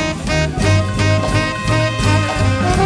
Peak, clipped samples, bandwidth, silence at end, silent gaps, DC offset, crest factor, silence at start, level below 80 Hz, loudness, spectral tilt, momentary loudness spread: -2 dBFS; under 0.1%; 11 kHz; 0 s; none; under 0.1%; 14 dB; 0 s; -26 dBFS; -16 LUFS; -5.5 dB/octave; 2 LU